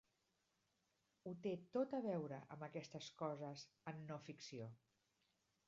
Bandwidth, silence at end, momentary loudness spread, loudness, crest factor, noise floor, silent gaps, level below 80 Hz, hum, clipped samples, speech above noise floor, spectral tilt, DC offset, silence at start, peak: 7.4 kHz; 0.9 s; 11 LU; -50 LUFS; 20 dB; -86 dBFS; none; -90 dBFS; none; under 0.1%; 37 dB; -6 dB/octave; under 0.1%; 1.25 s; -30 dBFS